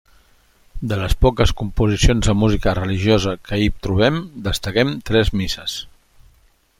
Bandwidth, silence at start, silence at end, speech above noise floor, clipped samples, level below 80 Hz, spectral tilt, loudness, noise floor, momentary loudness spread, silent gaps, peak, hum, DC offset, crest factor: 16 kHz; 0.75 s; 0.9 s; 38 dB; under 0.1%; -26 dBFS; -5.5 dB/octave; -19 LUFS; -56 dBFS; 8 LU; none; -2 dBFS; none; under 0.1%; 16 dB